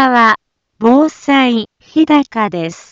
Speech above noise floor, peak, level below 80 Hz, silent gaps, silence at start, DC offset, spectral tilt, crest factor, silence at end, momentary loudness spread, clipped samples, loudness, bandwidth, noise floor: 17 dB; 0 dBFS; -56 dBFS; none; 0 s; under 0.1%; -5 dB/octave; 12 dB; 0.15 s; 8 LU; under 0.1%; -13 LUFS; 7.6 kHz; -30 dBFS